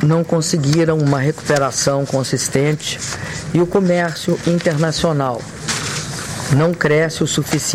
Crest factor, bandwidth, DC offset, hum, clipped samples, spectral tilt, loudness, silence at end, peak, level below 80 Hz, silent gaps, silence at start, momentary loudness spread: 16 dB; 15.5 kHz; under 0.1%; none; under 0.1%; -5 dB/octave; -17 LUFS; 0 s; -2 dBFS; -44 dBFS; none; 0 s; 7 LU